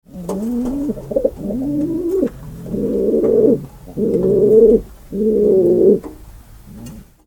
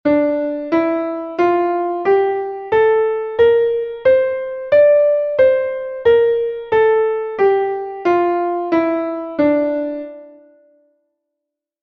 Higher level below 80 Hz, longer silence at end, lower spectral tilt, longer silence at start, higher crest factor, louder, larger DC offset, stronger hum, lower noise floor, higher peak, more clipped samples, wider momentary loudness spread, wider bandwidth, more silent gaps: first, -38 dBFS vs -54 dBFS; second, 0.25 s vs 1.55 s; first, -9.5 dB/octave vs -7.5 dB/octave; about the same, 0.15 s vs 0.05 s; about the same, 16 dB vs 14 dB; about the same, -16 LUFS vs -16 LUFS; neither; neither; second, -39 dBFS vs -81 dBFS; about the same, 0 dBFS vs -2 dBFS; neither; first, 18 LU vs 8 LU; first, 18.5 kHz vs 5.8 kHz; neither